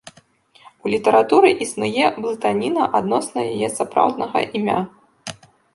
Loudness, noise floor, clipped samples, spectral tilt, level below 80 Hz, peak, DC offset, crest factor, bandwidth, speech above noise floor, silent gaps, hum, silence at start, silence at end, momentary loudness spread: -19 LUFS; -53 dBFS; under 0.1%; -4.5 dB/octave; -62 dBFS; -2 dBFS; under 0.1%; 18 dB; 11.5 kHz; 35 dB; none; none; 0.05 s; 0.45 s; 16 LU